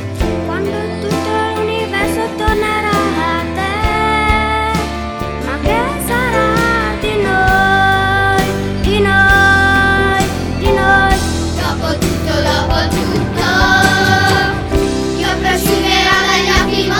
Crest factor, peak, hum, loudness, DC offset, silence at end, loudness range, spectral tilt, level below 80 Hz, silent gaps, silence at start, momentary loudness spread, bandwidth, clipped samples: 14 dB; 0 dBFS; none; -13 LUFS; under 0.1%; 0 s; 4 LU; -4.5 dB/octave; -24 dBFS; none; 0 s; 8 LU; over 20 kHz; under 0.1%